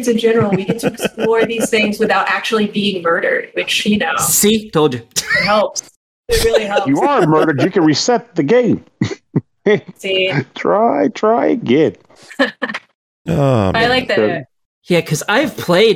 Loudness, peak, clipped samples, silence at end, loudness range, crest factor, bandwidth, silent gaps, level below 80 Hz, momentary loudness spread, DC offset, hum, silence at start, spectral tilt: -15 LUFS; 0 dBFS; under 0.1%; 0 s; 2 LU; 14 dB; 17 kHz; 5.96-6.23 s, 12.95-13.25 s, 14.65-14.82 s; -40 dBFS; 7 LU; under 0.1%; none; 0 s; -4 dB/octave